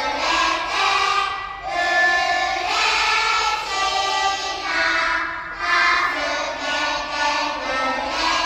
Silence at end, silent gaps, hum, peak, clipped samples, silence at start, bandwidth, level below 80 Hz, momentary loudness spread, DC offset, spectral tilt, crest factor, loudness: 0 s; none; none; -6 dBFS; under 0.1%; 0 s; 16 kHz; -48 dBFS; 6 LU; under 0.1%; -0.5 dB/octave; 14 dB; -19 LUFS